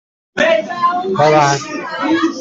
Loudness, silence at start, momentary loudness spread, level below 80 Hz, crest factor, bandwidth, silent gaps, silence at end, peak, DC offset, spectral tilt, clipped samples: -15 LUFS; 0.35 s; 9 LU; -56 dBFS; 14 dB; 8 kHz; none; 0 s; -2 dBFS; under 0.1%; -4.5 dB/octave; under 0.1%